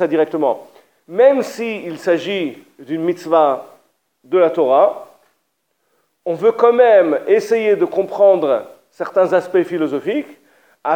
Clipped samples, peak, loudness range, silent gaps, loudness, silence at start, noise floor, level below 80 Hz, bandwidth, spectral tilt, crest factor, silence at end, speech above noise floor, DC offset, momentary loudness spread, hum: under 0.1%; 0 dBFS; 4 LU; none; -16 LUFS; 0 s; -69 dBFS; -76 dBFS; 16.5 kHz; -6 dB/octave; 16 dB; 0 s; 54 dB; under 0.1%; 13 LU; none